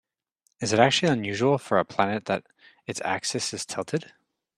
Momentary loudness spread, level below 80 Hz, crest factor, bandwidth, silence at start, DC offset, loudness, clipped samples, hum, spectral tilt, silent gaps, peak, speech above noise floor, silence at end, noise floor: 12 LU; -66 dBFS; 24 dB; 14 kHz; 0.6 s; under 0.1%; -25 LUFS; under 0.1%; none; -4 dB/octave; none; -2 dBFS; 47 dB; 0.55 s; -73 dBFS